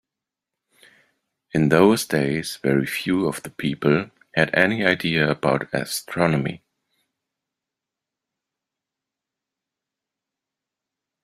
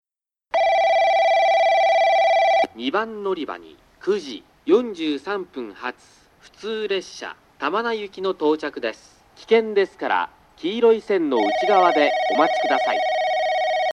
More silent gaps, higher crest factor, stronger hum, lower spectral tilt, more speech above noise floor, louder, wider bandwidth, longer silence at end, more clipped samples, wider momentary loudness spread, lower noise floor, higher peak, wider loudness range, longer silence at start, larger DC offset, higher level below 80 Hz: neither; first, 24 dB vs 18 dB; neither; first, -5.5 dB/octave vs -4 dB/octave; first, 66 dB vs 45 dB; about the same, -21 LUFS vs -20 LUFS; first, 16 kHz vs 11 kHz; first, 4.65 s vs 0 s; neither; second, 10 LU vs 14 LU; first, -87 dBFS vs -67 dBFS; first, 0 dBFS vs -4 dBFS; about the same, 8 LU vs 8 LU; first, 1.55 s vs 0.55 s; neither; first, -58 dBFS vs -64 dBFS